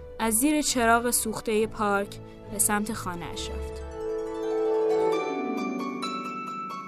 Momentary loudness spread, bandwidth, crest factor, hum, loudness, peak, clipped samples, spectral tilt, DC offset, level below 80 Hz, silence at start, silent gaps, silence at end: 12 LU; 14 kHz; 18 dB; none; -27 LUFS; -8 dBFS; under 0.1%; -3 dB/octave; under 0.1%; -46 dBFS; 0 s; none; 0 s